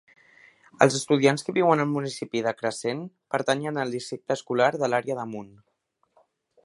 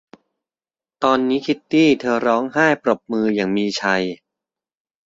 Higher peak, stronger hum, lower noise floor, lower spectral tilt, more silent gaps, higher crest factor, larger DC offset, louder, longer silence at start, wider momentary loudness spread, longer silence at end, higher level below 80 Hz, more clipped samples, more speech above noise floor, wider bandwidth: about the same, -2 dBFS vs -2 dBFS; neither; second, -71 dBFS vs under -90 dBFS; about the same, -5 dB/octave vs -5 dB/octave; neither; first, 26 dB vs 18 dB; neither; second, -25 LUFS vs -19 LUFS; second, 0.8 s vs 1 s; first, 10 LU vs 6 LU; first, 1.15 s vs 0.9 s; second, -72 dBFS vs -62 dBFS; neither; second, 46 dB vs over 72 dB; first, 11.5 kHz vs 7.8 kHz